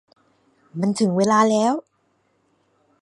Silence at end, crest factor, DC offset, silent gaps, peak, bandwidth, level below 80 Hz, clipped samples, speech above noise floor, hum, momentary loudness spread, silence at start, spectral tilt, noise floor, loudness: 1.2 s; 20 dB; under 0.1%; none; -2 dBFS; 11.5 kHz; -70 dBFS; under 0.1%; 48 dB; none; 11 LU; 0.75 s; -5.5 dB/octave; -66 dBFS; -20 LUFS